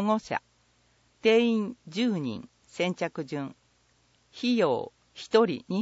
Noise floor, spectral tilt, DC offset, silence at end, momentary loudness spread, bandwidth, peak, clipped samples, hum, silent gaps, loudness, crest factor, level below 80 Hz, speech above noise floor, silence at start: -66 dBFS; -6 dB/octave; under 0.1%; 0 s; 16 LU; 8 kHz; -8 dBFS; under 0.1%; none; none; -28 LUFS; 20 dB; -72 dBFS; 40 dB; 0 s